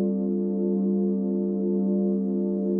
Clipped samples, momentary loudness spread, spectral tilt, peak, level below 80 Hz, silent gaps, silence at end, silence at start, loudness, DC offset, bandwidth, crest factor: under 0.1%; 2 LU; -15 dB/octave; -14 dBFS; -70 dBFS; none; 0 s; 0 s; -25 LUFS; under 0.1%; 1.4 kHz; 10 dB